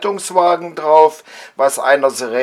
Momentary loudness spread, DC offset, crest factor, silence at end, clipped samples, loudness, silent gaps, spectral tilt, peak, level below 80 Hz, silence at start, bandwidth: 8 LU; under 0.1%; 14 dB; 0 s; under 0.1%; -14 LUFS; none; -2.5 dB/octave; 0 dBFS; -72 dBFS; 0 s; 15.5 kHz